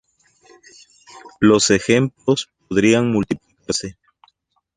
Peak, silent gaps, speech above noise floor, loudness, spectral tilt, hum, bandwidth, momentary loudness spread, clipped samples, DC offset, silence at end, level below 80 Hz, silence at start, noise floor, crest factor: -2 dBFS; none; 47 dB; -18 LUFS; -4.5 dB/octave; none; 11 kHz; 10 LU; under 0.1%; under 0.1%; 0.85 s; -50 dBFS; 1.15 s; -64 dBFS; 18 dB